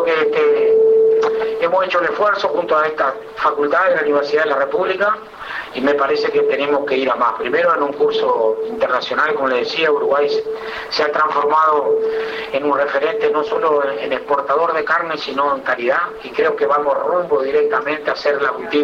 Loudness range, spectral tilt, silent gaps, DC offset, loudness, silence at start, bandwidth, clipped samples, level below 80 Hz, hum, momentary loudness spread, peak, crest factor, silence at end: 2 LU; -4.5 dB/octave; none; under 0.1%; -17 LUFS; 0 s; 7 kHz; under 0.1%; -58 dBFS; none; 6 LU; -6 dBFS; 12 dB; 0 s